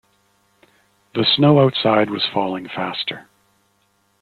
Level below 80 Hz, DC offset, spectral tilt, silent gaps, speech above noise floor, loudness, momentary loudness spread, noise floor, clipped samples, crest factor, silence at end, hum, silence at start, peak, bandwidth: -60 dBFS; under 0.1%; -8 dB/octave; none; 46 dB; -18 LUFS; 13 LU; -63 dBFS; under 0.1%; 18 dB; 1 s; none; 1.15 s; -2 dBFS; 4.9 kHz